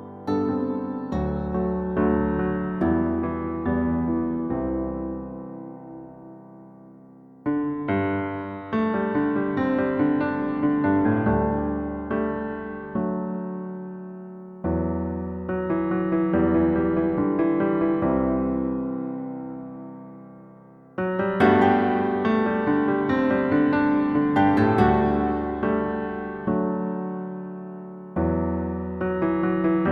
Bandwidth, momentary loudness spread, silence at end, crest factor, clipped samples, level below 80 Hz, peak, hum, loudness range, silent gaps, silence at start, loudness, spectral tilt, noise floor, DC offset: 5.6 kHz; 15 LU; 0 s; 20 dB; under 0.1%; -42 dBFS; -4 dBFS; none; 8 LU; none; 0 s; -24 LUFS; -9.5 dB/octave; -48 dBFS; under 0.1%